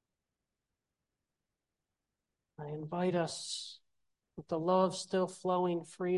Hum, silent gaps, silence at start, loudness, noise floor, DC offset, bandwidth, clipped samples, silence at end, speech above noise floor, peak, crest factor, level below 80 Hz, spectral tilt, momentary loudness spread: none; none; 2.6 s; -35 LUFS; -89 dBFS; under 0.1%; 11.5 kHz; under 0.1%; 0 s; 55 dB; -16 dBFS; 22 dB; -78 dBFS; -5.5 dB/octave; 17 LU